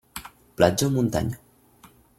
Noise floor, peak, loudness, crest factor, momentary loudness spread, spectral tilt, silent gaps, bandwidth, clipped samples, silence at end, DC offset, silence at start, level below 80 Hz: -54 dBFS; -2 dBFS; -23 LUFS; 22 dB; 20 LU; -5.5 dB/octave; none; 16.5 kHz; under 0.1%; 0.85 s; under 0.1%; 0.15 s; -50 dBFS